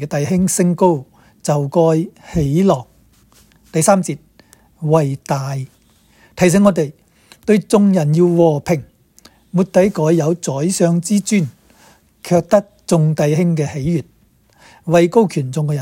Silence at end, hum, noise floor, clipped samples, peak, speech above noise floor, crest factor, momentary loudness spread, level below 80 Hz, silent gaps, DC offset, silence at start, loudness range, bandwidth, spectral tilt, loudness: 0 s; none; -53 dBFS; under 0.1%; 0 dBFS; 39 dB; 16 dB; 10 LU; -46 dBFS; none; under 0.1%; 0 s; 3 LU; 16.5 kHz; -6.5 dB/octave; -16 LUFS